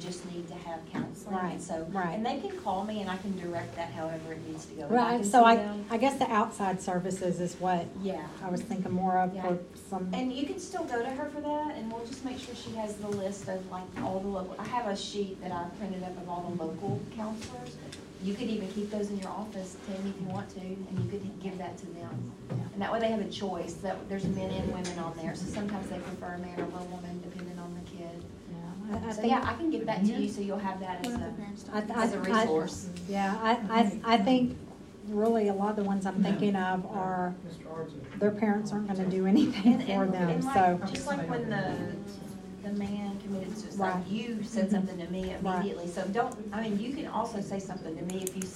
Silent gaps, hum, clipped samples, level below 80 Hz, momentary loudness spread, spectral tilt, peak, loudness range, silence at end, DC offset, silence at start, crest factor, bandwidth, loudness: none; none; under 0.1%; -60 dBFS; 13 LU; -6 dB/octave; -8 dBFS; 9 LU; 0 s; under 0.1%; 0 s; 24 dB; 13.5 kHz; -32 LUFS